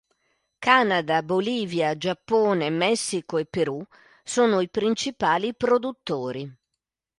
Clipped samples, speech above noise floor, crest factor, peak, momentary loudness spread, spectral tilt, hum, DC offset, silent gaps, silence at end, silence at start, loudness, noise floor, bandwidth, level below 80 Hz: under 0.1%; 60 dB; 22 dB; -2 dBFS; 10 LU; -4 dB/octave; none; under 0.1%; none; 0.7 s; 0.6 s; -24 LUFS; -84 dBFS; 11.5 kHz; -64 dBFS